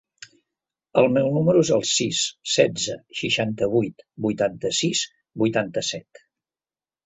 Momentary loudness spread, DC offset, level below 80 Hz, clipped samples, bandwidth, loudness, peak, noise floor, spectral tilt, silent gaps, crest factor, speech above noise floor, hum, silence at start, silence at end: 9 LU; under 0.1%; -60 dBFS; under 0.1%; 8.4 kHz; -22 LUFS; -2 dBFS; under -90 dBFS; -4 dB/octave; none; 22 dB; over 68 dB; none; 0.95 s; 1.05 s